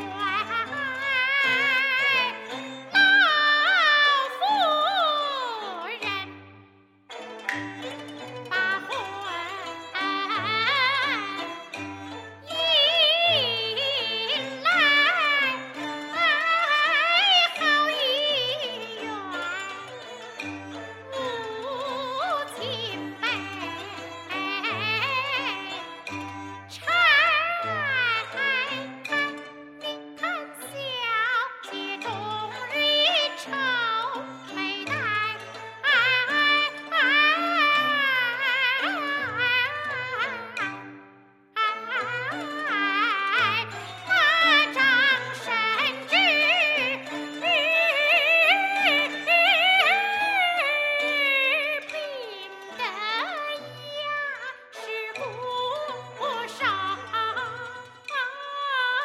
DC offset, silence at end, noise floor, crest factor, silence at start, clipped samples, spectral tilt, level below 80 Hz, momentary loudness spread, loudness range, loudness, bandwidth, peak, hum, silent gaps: under 0.1%; 0 s; -55 dBFS; 20 dB; 0 s; under 0.1%; -2.5 dB/octave; -76 dBFS; 17 LU; 10 LU; -23 LUFS; 16 kHz; -6 dBFS; none; none